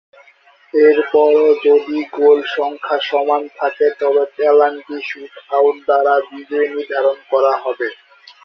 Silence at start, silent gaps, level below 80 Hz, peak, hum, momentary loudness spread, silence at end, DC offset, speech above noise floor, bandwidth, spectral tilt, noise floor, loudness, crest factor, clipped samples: 0.75 s; none; -66 dBFS; -2 dBFS; none; 11 LU; 0.5 s; under 0.1%; 35 dB; 6 kHz; -4.5 dB/octave; -50 dBFS; -15 LUFS; 14 dB; under 0.1%